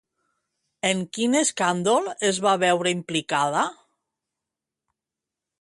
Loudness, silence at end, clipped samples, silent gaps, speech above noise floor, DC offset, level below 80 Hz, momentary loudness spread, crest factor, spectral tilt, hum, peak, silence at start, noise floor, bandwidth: -23 LUFS; 1.9 s; under 0.1%; none; 65 dB; under 0.1%; -70 dBFS; 5 LU; 18 dB; -3.5 dB/octave; none; -6 dBFS; 0.85 s; -88 dBFS; 11.5 kHz